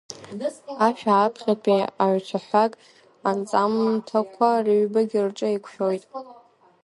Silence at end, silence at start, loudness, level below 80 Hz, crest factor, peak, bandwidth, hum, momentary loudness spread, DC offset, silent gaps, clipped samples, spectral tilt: 0.5 s; 0.1 s; -23 LUFS; -74 dBFS; 18 dB; -6 dBFS; 11.5 kHz; none; 11 LU; under 0.1%; none; under 0.1%; -6 dB/octave